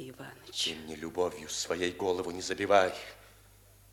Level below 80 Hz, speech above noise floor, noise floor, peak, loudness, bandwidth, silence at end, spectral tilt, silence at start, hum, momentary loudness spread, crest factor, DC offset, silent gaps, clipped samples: -64 dBFS; 26 dB; -59 dBFS; -10 dBFS; -32 LUFS; 19.5 kHz; 0.6 s; -3 dB/octave; 0 s; none; 17 LU; 22 dB; under 0.1%; none; under 0.1%